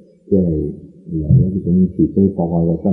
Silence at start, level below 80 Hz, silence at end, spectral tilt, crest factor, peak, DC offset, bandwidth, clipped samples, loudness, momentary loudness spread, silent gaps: 0.3 s; -34 dBFS; 0 s; -15.5 dB/octave; 14 dB; -2 dBFS; under 0.1%; 1.1 kHz; under 0.1%; -16 LUFS; 11 LU; none